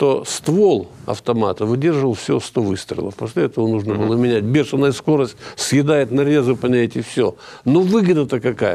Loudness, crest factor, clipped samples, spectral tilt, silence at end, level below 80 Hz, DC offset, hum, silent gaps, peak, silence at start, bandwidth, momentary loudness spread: -18 LUFS; 14 dB; under 0.1%; -6 dB/octave; 0 s; -58 dBFS; under 0.1%; none; none; -4 dBFS; 0 s; 14.5 kHz; 8 LU